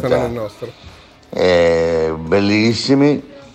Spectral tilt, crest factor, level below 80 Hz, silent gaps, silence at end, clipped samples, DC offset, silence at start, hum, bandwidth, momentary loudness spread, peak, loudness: -6 dB/octave; 12 dB; -42 dBFS; none; 0.05 s; under 0.1%; under 0.1%; 0 s; none; 11 kHz; 15 LU; -4 dBFS; -15 LUFS